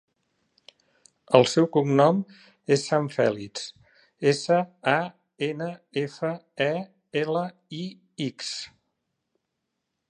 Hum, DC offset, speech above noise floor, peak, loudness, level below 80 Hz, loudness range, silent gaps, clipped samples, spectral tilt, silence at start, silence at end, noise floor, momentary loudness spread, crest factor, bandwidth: none; under 0.1%; 56 dB; -2 dBFS; -25 LUFS; -72 dBFS; 8 LU; none; under 0.1%; -5.5 dB/octave; 1.3 s; 1.45 s; -81 dBFS; 16 LU; 26 dB; 11.5 kHz